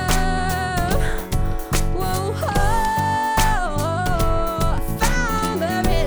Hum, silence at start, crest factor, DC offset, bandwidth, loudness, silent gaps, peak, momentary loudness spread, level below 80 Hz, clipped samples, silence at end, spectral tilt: none; 0 s; 16 dB; under 0.1%; over 20 kHz; -21 LUFS; none; -4 dBFS; 4 LU; -24 dBFS; under 0.1%; 0 s; -4.5 dB/octave